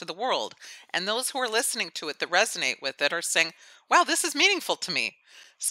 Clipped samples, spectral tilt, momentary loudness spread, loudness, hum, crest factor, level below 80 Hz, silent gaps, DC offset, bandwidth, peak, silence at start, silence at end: under 0.1%; -0.5 dB/octave; 10 LU; -25 LUFS; none; 22 dB; -88 dBFS; none; under 0.1%; 16 kHz; -6 dBFS; 0 s; 0 s